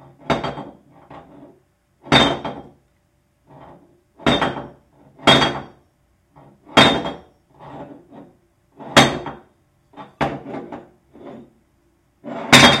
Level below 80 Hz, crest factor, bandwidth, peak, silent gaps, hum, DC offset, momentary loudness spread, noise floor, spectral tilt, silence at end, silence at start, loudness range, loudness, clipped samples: -46 dBFS; 22 dB; 16.5 kHz; 0 dBFS; none; none; under 0.1%; 27 LU; -63 dBFS; -3.5 dB/octave; 0 s; 0.3 s; 5 LU; -16 LUFS; under 0.1%